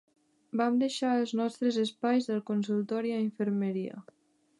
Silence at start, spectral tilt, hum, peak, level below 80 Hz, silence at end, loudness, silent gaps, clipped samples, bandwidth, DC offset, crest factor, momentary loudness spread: 0.55 s; -6 dB/octave; none; -16 dBFS; -84 dBFS; 0.6 s; -30 LUFS; none; under 0.1%; 11.5 kHz; under 0.1%; 16 dB; 6 LU